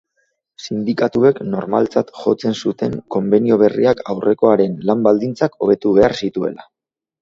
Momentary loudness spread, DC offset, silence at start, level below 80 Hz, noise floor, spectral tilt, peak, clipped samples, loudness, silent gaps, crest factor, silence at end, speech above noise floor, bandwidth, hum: 9 LU; under 0.1%; 0.6 s; -54 dBFS; -67 dBFS; -7 dB/octave; 0 dBFS; under 0.1%; -17 LUFS; none; 16 dB; 0.6 s; 52 dB; 7.6 kHz; none